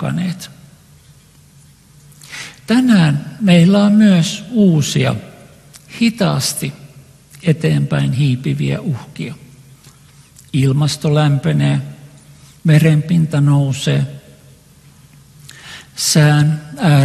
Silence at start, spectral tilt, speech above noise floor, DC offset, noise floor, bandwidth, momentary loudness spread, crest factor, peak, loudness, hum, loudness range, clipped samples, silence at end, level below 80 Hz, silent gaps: 0 s; -6 dB/octave; 32 dB; under 0.1%; -46 dBFS; 13 kHz; 18 LU; 16 dB; 0 dBFS; -14 LUFS; none; 6 LU; under 0.1%; 0 s; -50 dBFS; none